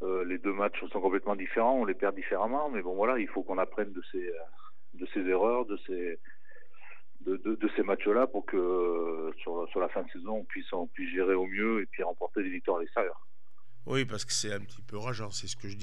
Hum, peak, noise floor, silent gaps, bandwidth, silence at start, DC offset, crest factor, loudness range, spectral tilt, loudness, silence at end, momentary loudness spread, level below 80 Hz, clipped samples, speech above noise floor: none; -14 dBFS; -70 dBFS; none; 12 kHz; 0 s; 2%; 18 dB; 4 LU; -4.5 dB/octave; -32 LUFS; 0 s; 10 LU; -76 dBFS; under 0.1%; 38 dB